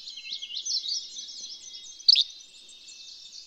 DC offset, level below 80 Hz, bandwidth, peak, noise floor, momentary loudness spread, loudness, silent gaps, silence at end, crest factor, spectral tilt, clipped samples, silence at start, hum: under 0.1%; -76 dBFS; 12 kHz; -6 dBFS; -49 dBFS; 26 LU; -24 LUFS; none; 0 s; 24 dB; 4.5 dB/octave; under 0.1%; 0 s; none